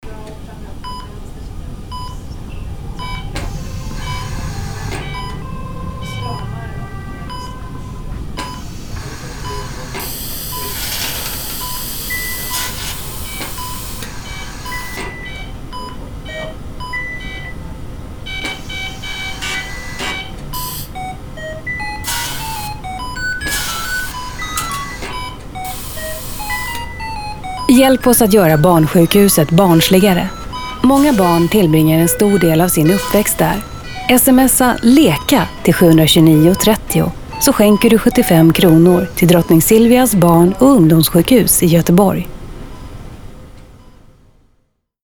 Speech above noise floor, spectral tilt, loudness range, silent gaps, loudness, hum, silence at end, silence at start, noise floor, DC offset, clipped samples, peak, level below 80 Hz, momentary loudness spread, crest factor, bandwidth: 51 dB; -5 dB/octave; 16 LU; none; -13 LUFS; none; 1.25 s; 0.05 s; -61 dBFS; under 0.1%; under 0.1%; 0 dBFS; -30 dBFS; 20 LU; 14 dB; over 20 kHz